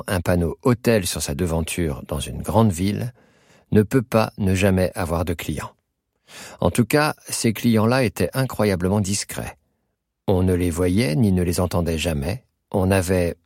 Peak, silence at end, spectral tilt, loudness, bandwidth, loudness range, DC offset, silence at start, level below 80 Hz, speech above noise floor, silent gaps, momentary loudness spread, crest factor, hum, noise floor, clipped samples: -2 dBFS; 0.1 s; -5.5 dB/octave; -21 LUFS; 16.5 kHz; 2 LU; under 0.1%; 0.05 s; -40 dBFS; 54 dB; none; 10 LU; 18 dB; none; -75 dBFS; under 0.1%